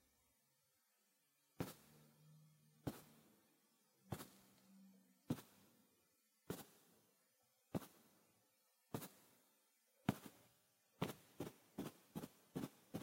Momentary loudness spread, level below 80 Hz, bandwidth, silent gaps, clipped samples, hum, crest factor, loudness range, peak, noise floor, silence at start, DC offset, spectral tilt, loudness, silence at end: 20 LU; -78 dBFS; 16 kHz; none; under 0.1%; none; 34 dB; 6 LU; -22 dBFS; -82 dBFS; 1.6 s; under 0.1%; -5.5 dB/octave; -53 LUFS; 0 s